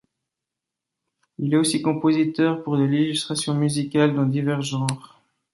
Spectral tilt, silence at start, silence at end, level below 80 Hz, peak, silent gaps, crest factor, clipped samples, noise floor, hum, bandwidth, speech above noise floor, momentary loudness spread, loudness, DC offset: -5.5 dB/octave; 1.4 s; 0.55 s; -66 dBFS; -4 dBFS; none; 18 dB; under 0.1%; -85 dBFS; none; 11.5 kHz; 64 dB; 5 LU; -22 LUFS; under 0.1%